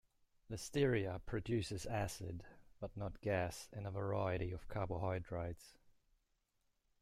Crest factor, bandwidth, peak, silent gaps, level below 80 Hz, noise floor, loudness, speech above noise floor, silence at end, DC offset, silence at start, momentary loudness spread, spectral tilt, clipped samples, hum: 20 dB; 15 kHz; -22 dBFS; none; -60 dBFS; -82 dBFS; -42 LUFS; 41 dB; 1.1 s; under 0.1%; 0.5 s; 13 LU; -6 dB/octave; under 0.1%; none